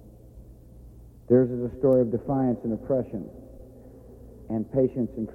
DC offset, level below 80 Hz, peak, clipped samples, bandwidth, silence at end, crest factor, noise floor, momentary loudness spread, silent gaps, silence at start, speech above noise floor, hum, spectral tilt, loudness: under 0.1%; -50 dBFS; -8 dBFS; under 0.1%; 2.8 kHz; 0 s; 20 dB; -47 dBFS; 14 LU; none; 0.05 s; 23 dB; none; -11.5 dB/octave; -25 LUFS